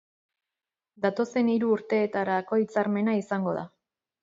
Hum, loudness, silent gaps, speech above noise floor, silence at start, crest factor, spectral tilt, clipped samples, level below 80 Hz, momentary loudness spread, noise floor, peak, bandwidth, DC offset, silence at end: none; -27 LUFS; none; over 64 dB; 1 s; 18 dB; -7.5 dB/octave; under 0.1%; -74 dBFS; 5 LU; under -90 dBFS; -10 dBFS; 7.8 kHz; under 0.1%; 0.55 s